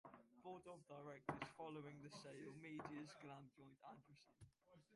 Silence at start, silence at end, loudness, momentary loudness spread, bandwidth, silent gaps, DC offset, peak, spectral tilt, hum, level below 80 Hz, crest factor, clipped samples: 0.05 s; 0 s; -57 LUFS; 12 LU; 11.5 kHz; none; under 0.1%; -32 dBFS; -5.5 dB/octave; none; -84 dBFS; 26 dB; under 0.1%